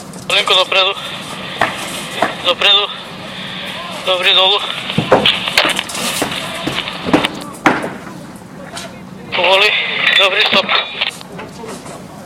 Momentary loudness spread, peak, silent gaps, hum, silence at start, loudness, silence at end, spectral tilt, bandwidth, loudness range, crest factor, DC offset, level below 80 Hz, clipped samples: 20 LU; 0 dBFS; none; none; 0 s; -13 LUFS; 0 s; -2.5 dB/octave; 17.5 kHz; 4 LU; 16 dB; under 0.1%; -50 dBFS; under 0.1%